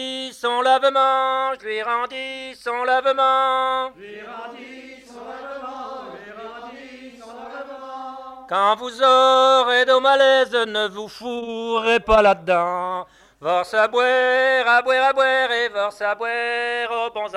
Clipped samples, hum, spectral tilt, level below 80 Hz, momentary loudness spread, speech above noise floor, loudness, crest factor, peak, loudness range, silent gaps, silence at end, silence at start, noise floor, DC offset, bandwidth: under 0.1%; none; -2.5 dB/octave; -50 dBFS; 21 LU; 21 dB; -18 LUFS; 16 dB; -4 dBFS; 18 LU; none; 0 s; 0 s; -40 dBFS; under 0.1%; 11.5 kHz